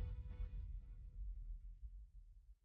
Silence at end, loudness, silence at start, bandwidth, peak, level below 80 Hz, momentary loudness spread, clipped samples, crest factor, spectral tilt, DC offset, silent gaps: 0.1 s; -55 LUFS; 0 s; 3.7 kHz; -36 dBFS; -50 dBFS; 13 LU; under 0.1%; 14 dB; -8.5 dB/octave; under 0.1%; none